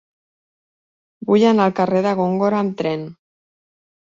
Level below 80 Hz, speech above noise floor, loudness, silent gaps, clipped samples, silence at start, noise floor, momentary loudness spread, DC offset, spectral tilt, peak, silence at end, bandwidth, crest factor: -62 dBFS; over 73 dB; -18 LUFS; none; under 0.1%; 1.2 s; under -90 dBFS; 13 LU; under 0.1%; -7.5 dB/octave; -4 dBFS; 1 s; 7.6 kHz; 16 dB